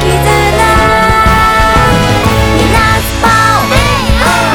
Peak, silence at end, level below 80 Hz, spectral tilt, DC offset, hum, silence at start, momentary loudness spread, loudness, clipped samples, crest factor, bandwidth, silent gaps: 0 dBFS; 0 s; -16 dBFS; -4.5 dB/octave; under 0.1%; none; 0 s; 2 LU; -8 LUFS; 2%; 8 dB; over 20 kHz; none